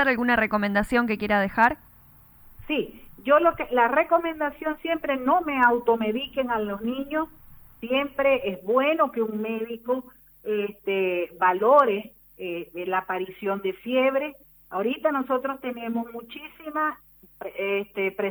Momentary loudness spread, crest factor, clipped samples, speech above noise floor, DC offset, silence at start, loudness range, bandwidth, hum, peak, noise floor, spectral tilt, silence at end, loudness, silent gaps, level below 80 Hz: 14 LU; 18 dB; under 0.1%; 29 dB; under 0.1%; 0 s; 4 LU; over 20 kHz; none; -6 dBFS; -53 dBFS; -6.5 dB/octave; 0 s; -25 LUFS; none; -54 dBFS